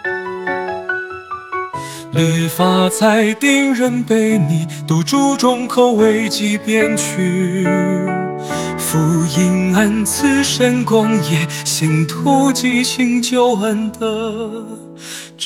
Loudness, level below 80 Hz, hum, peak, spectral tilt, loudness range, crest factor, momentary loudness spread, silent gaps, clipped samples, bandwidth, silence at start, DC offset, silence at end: -15 LUFS; -56 dBFS; none; 0 dBFS; -5 dB/octave; 2 LU; 14 dB; 10 LU; none; under 0.1%; 17.5 kHz; 0 s; under 0.1%; 0 s